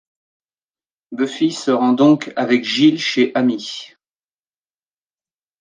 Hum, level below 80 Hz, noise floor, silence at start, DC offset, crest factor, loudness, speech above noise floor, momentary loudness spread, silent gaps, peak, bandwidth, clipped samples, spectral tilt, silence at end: none; -70 dBFS; under -90 dBFS; 1.1 s; under 0.1%; 16 dB; -16 LUFS; over 74 dB; 13 LU; none; -2 dBFS; 9.6 kHz; under 0.1%; -5 dB/octave; 1.75 s